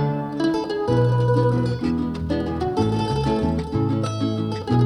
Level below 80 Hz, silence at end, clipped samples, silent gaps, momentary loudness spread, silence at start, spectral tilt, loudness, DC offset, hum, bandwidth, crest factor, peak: -38 dBFS; 0 s; under 0.1%; none; 6 LU; 0 s; -8 dB/octave; -22 LUFS; under 0.1%; none; 10.5 kHz; 14 dB; -6 dBFS